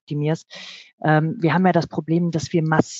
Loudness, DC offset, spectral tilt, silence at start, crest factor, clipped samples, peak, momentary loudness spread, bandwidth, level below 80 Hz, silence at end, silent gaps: -21 LUFS; under 0.1%; -6.5 dB/octave; 0.1 s; 18 dB; under 0.1%; -2 dBFS; 14 LU; 8 kHz; -60 dBFS; 0 s; 0.93-0.98 s